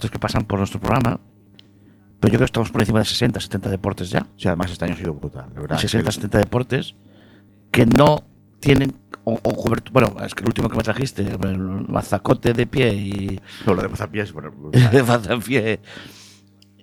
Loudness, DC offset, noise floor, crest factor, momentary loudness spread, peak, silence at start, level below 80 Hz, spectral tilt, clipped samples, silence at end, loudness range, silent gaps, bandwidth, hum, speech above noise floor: -20 LUFS; under 0.1%; -51 dBFS; 20 dB; 11 LU; 0 dBFS; 0 s; -40 dBFS; -6.5 dB/octave; under 0.1%; 0.6 s; 4 LU; none; 19 kHz; none; 32 dB